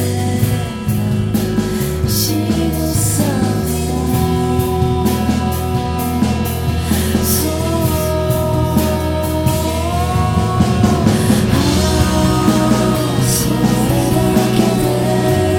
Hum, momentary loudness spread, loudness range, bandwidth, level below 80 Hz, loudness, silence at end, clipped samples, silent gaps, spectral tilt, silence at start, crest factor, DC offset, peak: none; 4 LU; 3 LU; 19.5 kHz; -26 dBFS; -15 LUFS; 0 s; under 0.1%; none; -5.5 dB/octave; 0 s; 14 dB; under 0.1%; 0 dBFS